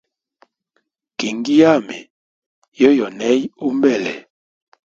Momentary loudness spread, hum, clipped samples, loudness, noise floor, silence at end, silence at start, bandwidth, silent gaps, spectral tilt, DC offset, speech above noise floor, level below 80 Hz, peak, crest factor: 20 LU; none; under 0.1%; -16 LUFS; -69 dBFS; 0.65 s; 1.2 s; 7.8 kHz; 2.10-2.62 s, 2.68-2.72 s; -5 dB/octave; under 0.1%; 54 dB; -64 dBFS; 0 dBFS; 18 dB